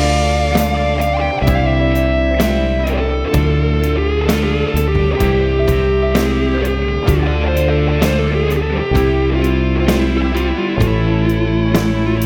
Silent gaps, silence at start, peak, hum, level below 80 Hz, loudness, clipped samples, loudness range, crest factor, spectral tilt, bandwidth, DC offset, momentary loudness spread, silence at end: none; 0 s; -2 dBFS; none; -20 dBFS; -15 LUFS; under 0.1%; 0 LU; 12 dB; -6.5 dB/octave; 19 kHz; under 0.1%; 2 LU; 0 s